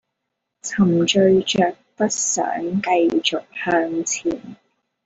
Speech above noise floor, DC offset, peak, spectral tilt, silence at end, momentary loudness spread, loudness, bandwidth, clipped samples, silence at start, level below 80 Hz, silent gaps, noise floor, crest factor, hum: 59 dB; under 0.1%; -2 dBFS; -4 dB/octave; 0.5 s; 10 LU; -19 LUFS; 8.2 kHz; under 0.1%; 0.65 s; -58 dBFS; none; -79 dBFS; 18 dB; none